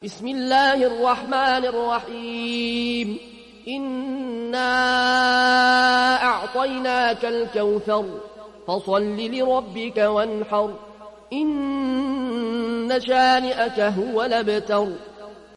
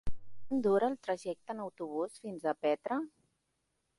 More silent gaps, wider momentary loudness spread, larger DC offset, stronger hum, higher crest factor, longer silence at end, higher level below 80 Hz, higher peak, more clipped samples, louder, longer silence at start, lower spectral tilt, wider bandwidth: neither; about the same, 12 LU vs 11 LU; neither; neither; about the same, 14 dB vs 16 dB; second, 0.15 s vs 0.9 s; about the same, -56 dBFS vs -56 dBFS; first, -8 dBFS vs -18 dBFS; neither; first, -21 LUFS vs -35 LUFS; about the same, 0 s vs 0.05 s; second, -4 dB/octave vs -6.5 dB/octave; about the same, 11.5 kHz vs 11.5 kHz